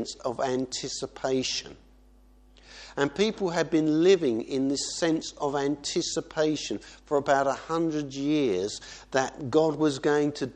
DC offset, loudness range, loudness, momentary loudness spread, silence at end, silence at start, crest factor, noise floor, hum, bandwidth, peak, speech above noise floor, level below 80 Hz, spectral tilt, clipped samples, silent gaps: under 0.1%; 4 LU; -27 LUFS; 9 LU; 0.05 s; 0 s; 18 dB; -56 dBFS; none; 10 kHz; -10 dBFS; 29 dB; -58 dBFS; -4.5 dB/octave; under 0.1%; none